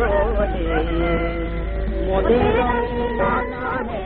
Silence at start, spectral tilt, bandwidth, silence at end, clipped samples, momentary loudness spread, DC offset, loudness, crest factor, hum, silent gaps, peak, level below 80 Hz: 0 s; -5.5 dB/octave; 4.4 kHz; 0 s; under 0.1%; 8 LU; under 0.1%; -21 LUFS; 16 dB; none; none; -4 dBFS; -26 dBFS